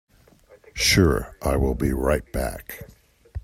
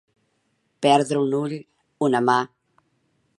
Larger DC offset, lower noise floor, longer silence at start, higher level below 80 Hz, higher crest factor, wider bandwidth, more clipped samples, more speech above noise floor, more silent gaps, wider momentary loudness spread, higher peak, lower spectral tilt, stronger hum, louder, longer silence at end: neither; second, -54 dBFS vs -70 dBFS; about the same, 0.75 s vs 0.8 s; first, -32 dBFS vs -76 dBFS; about the same, 20 dB vs 22 dB; first, 16 kHz vs 11.5 kHz; neither; second, 31 dB vs 50 dB; neither; first, 21 LU vs 13 LU; about the same, -4 dBFS vs -2 dBFS; about the same, -4.5 dB/octave vs -5.5 dB/octave; neither; about the same, -22 LUFS vs -21 LUFS; second, 0.05 s vs 0.9 s